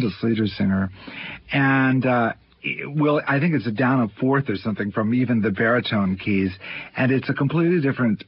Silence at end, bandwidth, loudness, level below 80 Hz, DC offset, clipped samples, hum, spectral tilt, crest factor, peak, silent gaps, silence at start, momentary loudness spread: 0.05 s; 5.8 kHz; -21 LUFS; -50 dBFS; under 0.1%; under 0.1%; none; -11.5 dB/octave; 14 dB; -8 dBFS; none; 0 s; 9 LU